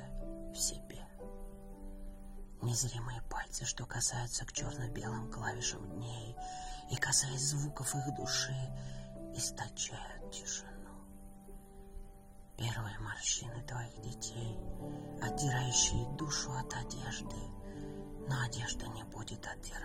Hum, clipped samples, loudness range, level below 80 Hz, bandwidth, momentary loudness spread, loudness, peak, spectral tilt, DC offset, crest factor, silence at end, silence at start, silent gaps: none; under 0.1%; 7 LU; -50 dBFS; 16 kHz; 18 LU; -38 LUFS; -16 dBFS; -3 dB/octave; under 0.1%; 24 dB; 0 s; 0 s; none